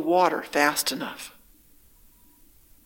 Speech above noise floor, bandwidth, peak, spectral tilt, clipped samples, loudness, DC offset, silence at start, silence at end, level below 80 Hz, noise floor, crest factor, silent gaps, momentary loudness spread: 32 dB; 17 kHz; -4 dBFS; -2.5 dB/octave; under 0.1%; -24 LUFS; under 0.1%; 0 s; 1.55 s; -62 dBFS; -56 dBFS; 24 dB; none; 17 LU